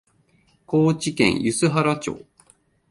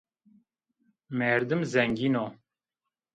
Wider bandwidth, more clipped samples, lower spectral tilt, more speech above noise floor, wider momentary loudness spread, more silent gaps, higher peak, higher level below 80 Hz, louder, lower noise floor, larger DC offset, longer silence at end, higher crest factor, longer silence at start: first, 11.5 kHz vs 9 kHz; neither; second, -5 dB/octave vs -6.5 dB/octave; second, 41 dB vs 62 dB; about the same, 9 LU vs 9 LU; neither; first, -4 dBFS vs -8 dBFS; first, -54 dBFS vs -66 dBFS; first, -21 LUFS vs -28 LUFS; second, -61 dBFS vs -88 dBFS; neither; about the same, 0.7 s vs 0.8 s; about the same, 18 dB vs 22 dB; second, 0.7 s vs 1.1 s